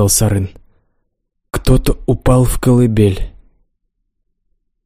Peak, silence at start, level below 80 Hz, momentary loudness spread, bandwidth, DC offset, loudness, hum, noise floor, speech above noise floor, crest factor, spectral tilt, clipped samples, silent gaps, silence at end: 0 dBFS; 0 s; -24 dBFS; 14 LU; 15.5 kHz; under 0.1%; -14 LUFS; none; -68 dBFS; 56 dB; 14 dB; -6 dB/octave; under 0.1%; none; 1.55 s